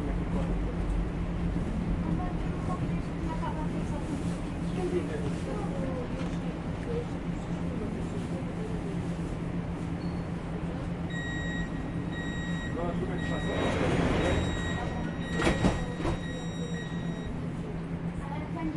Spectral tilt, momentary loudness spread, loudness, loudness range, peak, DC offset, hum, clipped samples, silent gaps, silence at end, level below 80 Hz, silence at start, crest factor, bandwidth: -7 dB/octave; 7 LU; -32 LUFS; 5 LU; -12 dBFS; under 0.1%; none; under 0.1%; none; 0 s; -40 dBFS; 0 s; 18 dB; 11.5 kHz